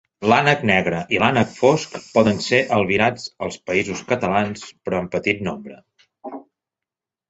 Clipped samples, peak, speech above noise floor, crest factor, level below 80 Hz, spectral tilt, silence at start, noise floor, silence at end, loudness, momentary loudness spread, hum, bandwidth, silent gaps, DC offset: under 0.1%; -2 dBFS; 68 dB; 20 dB; -52 dBFS; -5 dB/octave; 0.2 s; -88 dBFS; 0.9 s; -19 LUFS; 15 LU; none; 8.2 kHz; none; under 0.1%